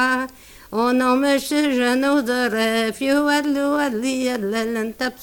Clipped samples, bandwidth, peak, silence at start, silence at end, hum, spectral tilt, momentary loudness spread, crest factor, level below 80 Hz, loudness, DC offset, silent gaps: under 0.1%; 19.5 kHz; -6 dBFS; 0 s; 0 s; none; -3.5 dB/octave; 6 LU; 14 dB; -54 dBFS; -20 LUFS; under 0.1%; none